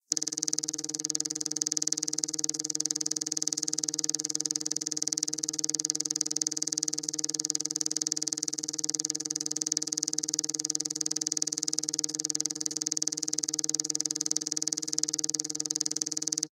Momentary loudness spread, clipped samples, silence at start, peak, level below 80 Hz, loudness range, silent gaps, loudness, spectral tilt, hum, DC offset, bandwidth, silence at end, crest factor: 2 LU; under 0.1%; 0.1 s; -2 dBFS; -84 dBFS; 1 LU; none; -29 LUFS; 0 dB/octave; none; under 0.1%; 16.5 kHz; 0.05 s; 30 dB